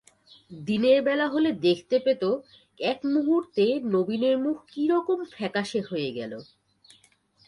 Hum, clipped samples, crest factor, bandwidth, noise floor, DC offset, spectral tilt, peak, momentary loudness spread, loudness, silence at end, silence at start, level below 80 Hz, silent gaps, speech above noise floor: none; under 0.1%; 16 dB; 11 kHz; -62 dBFS; under 0.1%; -6 dB/octave; -10 dBFS; 9 LU; -25 LUFS; 1.05 s; 0.5 s; -70 dBFS; none; 37 dB